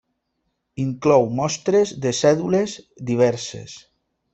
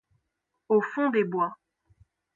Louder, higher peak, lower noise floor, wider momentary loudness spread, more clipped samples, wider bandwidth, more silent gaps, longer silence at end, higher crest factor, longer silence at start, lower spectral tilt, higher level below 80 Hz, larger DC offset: first, -20 LUFS vs -26 LUFS; first, -2 dBFS vs -10 dBFS; second, -74 dBFS vs -81 dBFS; first, 15 LU vs 5 LU; neither; first, 8.2 kHz vs 7.2 kHz; neither; second, 0.55 s vs 0.8 s; about the same, 18 dB vs 18 dB; about the same, 0.75 s vs 0.7 s; second, -5.5 dB/octave vs -8 dB/octave; first, -58 dBFS vs -72 dBFS; neither